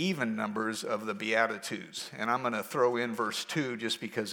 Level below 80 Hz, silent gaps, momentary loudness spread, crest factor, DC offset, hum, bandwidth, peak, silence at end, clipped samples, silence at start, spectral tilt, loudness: -84 dBFS; none; 7 LU; 20 dB; under 0.1%; none; over 20 kHz; -12 dBFS; 0 s; under 0.1%; 0 s; -4 dB/octave; -32 LUFS